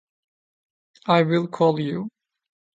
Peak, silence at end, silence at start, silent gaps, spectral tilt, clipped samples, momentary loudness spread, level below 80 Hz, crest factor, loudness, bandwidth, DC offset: -4 dBFS; 0.7 s; 1.05 s; none; -8 dB/octave; under 0.1%; 15 LU; -68 dBFS; 22 dB; -22 LUFS; 7.8 kHz; under 0.1%